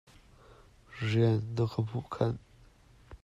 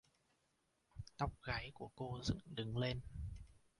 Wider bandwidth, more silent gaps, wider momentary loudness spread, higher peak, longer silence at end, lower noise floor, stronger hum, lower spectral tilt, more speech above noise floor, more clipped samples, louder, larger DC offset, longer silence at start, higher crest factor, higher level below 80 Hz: second, 7.8 kHz vs 11.5 kHz; neither; second, 12 LU vs 15 LU; first, -14 dBFS vs -26 dBFS; second, 0.05 s vs 0.2 s; second, -59 dBFS vs -82 dBFS; neither; first, -8 dB/octave vs -5.5 dB/octave; second, 29 dB vs 38 dB; neither; first, -32 LUFS vs -45 LUFS; neither; about the same, 0.9 s vs 0.95 s; about the same, 20 dB vs 20 dB; about the same, -58 dBFS vs -56 dBFS